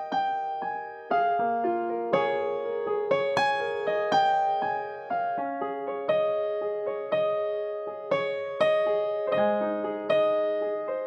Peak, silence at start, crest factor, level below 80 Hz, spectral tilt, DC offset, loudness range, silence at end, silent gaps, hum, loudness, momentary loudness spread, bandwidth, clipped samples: -10 dBFS; 0 s; 16 dB; -78 dBFS; -5.5 dB/octave; under 0.1%; 3 LU; 0 s; none; none; -27 LUFS; 7 LU; 8.4 kHz; under 0.1%